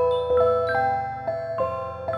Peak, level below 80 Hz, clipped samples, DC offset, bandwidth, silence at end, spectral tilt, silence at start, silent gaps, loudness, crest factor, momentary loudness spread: -10 dBFS; -50 dBFS; under 0.1%; under 0.1%; 5.6 kHz; 0 s; -7 dB/octave; 0 s; none; -24 LUFS; 14 dB; 8 LU